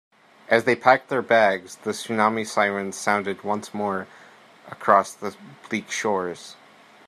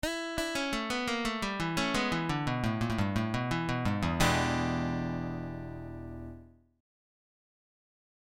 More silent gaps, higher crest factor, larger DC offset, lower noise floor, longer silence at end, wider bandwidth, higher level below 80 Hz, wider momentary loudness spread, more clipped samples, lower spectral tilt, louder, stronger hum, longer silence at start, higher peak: neither; about the same, 22 dB vs 20 dB; neither; second, -48 dBFS vs -52 dBFS; second, 0.55 s vs 1.8 s; second, 14 kHz vs 16.5 kHz; second, -72 dBFS vs -48 dBFS; about the same, 14 LU vs 14 LU; neither; about the same, -4 dB/octave vs -5 dB/octave; first, -23 LUFS vs -32 LUFS; neither; first, 0.5 s vs 0.05 s; first, -2 dBFS vs -12 dBFS